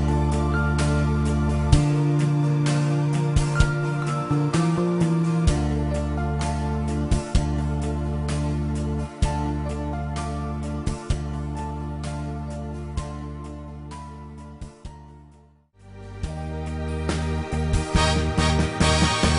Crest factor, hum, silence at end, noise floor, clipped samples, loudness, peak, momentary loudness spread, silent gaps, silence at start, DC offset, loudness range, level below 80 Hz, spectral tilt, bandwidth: 22 dB; none; 0 s; -54 dBFS; under 0.1%; -24 LUFS; -2 dBFS; 14 LU; none; 0 s; under 0.1%; 14 LU; -30 dBFS; -6 dB/octave; 11 kHz